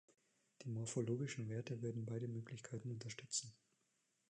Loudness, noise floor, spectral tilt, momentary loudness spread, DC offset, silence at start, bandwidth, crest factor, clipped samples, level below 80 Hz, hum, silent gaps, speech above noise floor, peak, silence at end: -46 LUFS; -84 dBFS; -5 dB/octave; 8 LU; under 0.1%; 0.6 s; 10.5 kHz; 18 dB; under 0.1%; -82 dBFS; none; none; 38 dB; -28 dBFS; 0.8 s